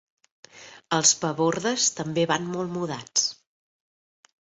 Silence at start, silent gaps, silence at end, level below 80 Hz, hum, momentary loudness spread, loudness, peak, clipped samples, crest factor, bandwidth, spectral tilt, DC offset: 0.55 s; none; 1.1 s; -68 dBFS; none; 10 LU; -24 LUFS; -4 dBFS; under 0.1%; 22 dB; 8.2 kHz; -2.5 dB/octave; under 0.1%